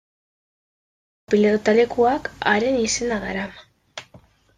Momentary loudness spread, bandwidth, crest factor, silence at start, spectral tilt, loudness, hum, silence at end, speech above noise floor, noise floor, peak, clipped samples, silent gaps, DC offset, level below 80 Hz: 21 LU; 10 kHz; 18 dB; 1.3 s; -4 dB/octave; -20 LUFS; none; 0.4 s; 32 dB; -52 dBFS; -4 dBFS; under 0.1%; none; under 0.1%; -52 dBFS